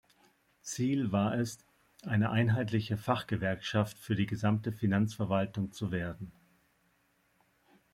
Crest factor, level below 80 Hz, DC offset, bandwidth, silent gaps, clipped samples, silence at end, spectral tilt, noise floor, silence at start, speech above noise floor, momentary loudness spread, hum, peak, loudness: 20 dB; -64 dBFS; under 0.1%; 15.5 kHz; none; under 0.1%; 1.65 s; -6.5 dB/octave; -72 dBFS; 0.65 s; 41 dB; 11 LU; none; -14 dBFS; -32 LUFS